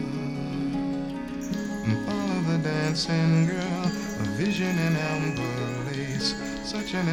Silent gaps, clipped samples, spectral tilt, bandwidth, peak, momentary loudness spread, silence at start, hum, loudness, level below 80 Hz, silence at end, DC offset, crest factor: none; under 0.1%; -5.5 dB/octave; 15.5 kHz; -12 dBFS; 7 LU; 0 s; none; -27 LUFS; -50 dBFS; 0 s; under 0.1%; 14 dB